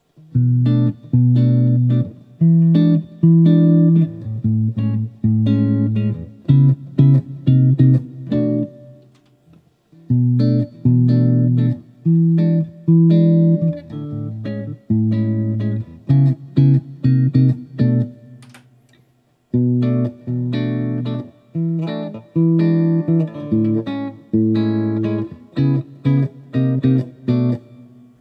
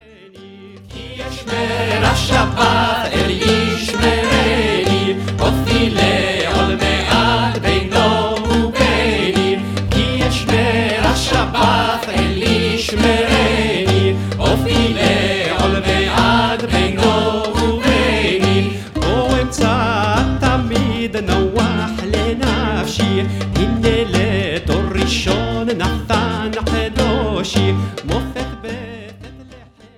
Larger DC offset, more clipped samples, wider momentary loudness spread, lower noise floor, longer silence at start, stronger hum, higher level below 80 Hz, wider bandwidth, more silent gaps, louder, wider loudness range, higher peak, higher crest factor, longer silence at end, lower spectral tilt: neither; neither; first, 11 LU vs 6 LU; first, -59 dBFS vs -41 dBFS; first, 0.35 s vs 0.2 s; neither; second, -56 dBFS vs -26 dBFS; second, 4.9 kHz vs 16 kHz; neither; about the same, -17 LUFS vs -16 LUFS; about the same, 5 LU vs 3 LU; about the same, -2 dBFS vs 0 dBFS; about the same, 14 dB vs 16 dB; first, 0.6 s vs 0.1 s; first, -11.5 dB/octave vs -5 dB/octave